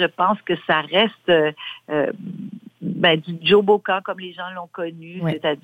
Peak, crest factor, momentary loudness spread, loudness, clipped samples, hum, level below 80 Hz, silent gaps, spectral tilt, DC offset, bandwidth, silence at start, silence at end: -4 dBFS; 18 dB; 15 LU; -20 LUFS; under 0.1%; none; -66 dBFS; none; -7 dB/octave; under 0.1%; 5 kHz; 0 s; 0.1 s